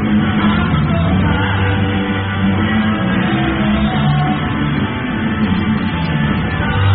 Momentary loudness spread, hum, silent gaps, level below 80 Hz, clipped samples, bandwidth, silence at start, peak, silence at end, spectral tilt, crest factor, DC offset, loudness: 3 LU; none; none; -28 dBFS; under 0.1%; 4.6 kHz; 0 s; -2 dBFS; 0 s; -5.5 dB/octave; 12 dB; 0.2%; -15 LUFS